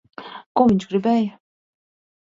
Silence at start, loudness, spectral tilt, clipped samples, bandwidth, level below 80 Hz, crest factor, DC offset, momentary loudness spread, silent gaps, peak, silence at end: 0.2 s; -20 LUFS; -7.5 dB/octave; under 0.1%; 7.6 kHz; -56 dBFS; 18 dB; under 0.1%; 18 LU; 0.46-0.55 s; -4 dBFS; 1.05 s